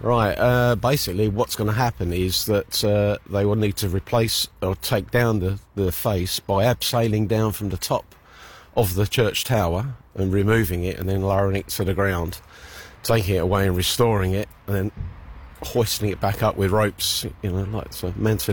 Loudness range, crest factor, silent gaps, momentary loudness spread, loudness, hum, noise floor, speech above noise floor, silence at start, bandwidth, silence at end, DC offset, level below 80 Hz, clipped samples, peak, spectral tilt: 2 LU; 14 dB; none; 8 LU; -22 LUFS; none; -45 dBFS; 24 dB; 0 s; 17.5 kHz; 0 s; under 0.1%; -40 dBFS; under 0.1%; -8 dBFS; -5 dB/octave